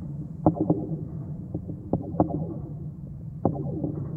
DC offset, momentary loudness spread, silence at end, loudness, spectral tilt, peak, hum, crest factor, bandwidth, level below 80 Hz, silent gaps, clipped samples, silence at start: under 0.1%; 11 LU; 0 s; -30 LUFS; -13.5 dB/octave; -6 dBFS; none; 24 dB; 1.9 kHz; -48 dBFS; none; under 0.1%; 0 s